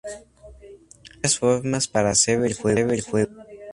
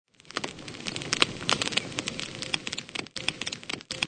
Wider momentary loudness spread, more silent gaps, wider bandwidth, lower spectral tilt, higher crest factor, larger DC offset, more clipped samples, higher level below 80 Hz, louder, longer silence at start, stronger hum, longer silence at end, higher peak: first, 14 LU vs 10 LU; neither; first, 11.5 kHz vs 9.6 kHz; first, -3.5 dB/octave vs -2 dB/octave; second, 18 dB vs 32 dB; neither; neither; first, -50 dBFS vs -60 dBFS; first, -21 LUFS vs -30 LUFS; second, 0.05 s vs 0.25 s; neither; about the same, 0 s vs 0 s; about the same, -4 dBFS vs -2 dBFS